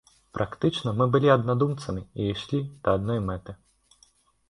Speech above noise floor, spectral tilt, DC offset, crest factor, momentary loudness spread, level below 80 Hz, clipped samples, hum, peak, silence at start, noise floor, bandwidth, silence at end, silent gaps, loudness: 37 dB; -7.5 dB/octave; under 0.1%; 22 dB; 13 LU; -50 dBFS; under 0.1%; none; -6 dBFS; 0.35 s; -62 dBFS; 11.5 kHz; 0.95 s; none; -26 LUFS